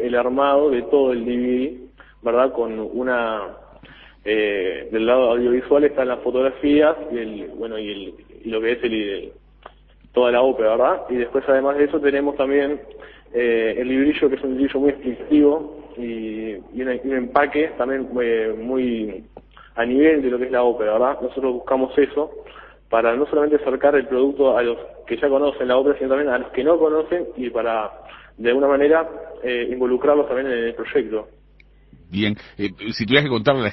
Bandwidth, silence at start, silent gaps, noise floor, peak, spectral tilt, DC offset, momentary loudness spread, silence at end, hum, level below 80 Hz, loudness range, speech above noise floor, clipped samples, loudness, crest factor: 6 kHz; 0 s; none; -51 dBFS; 0 dBFS; -7.5 dB/octave; under 0.1%; 12 LU; 0 s; none; -50 dBFS; 4 LU; 31 dB; under 0.1%; -20 LUFS; 20 dB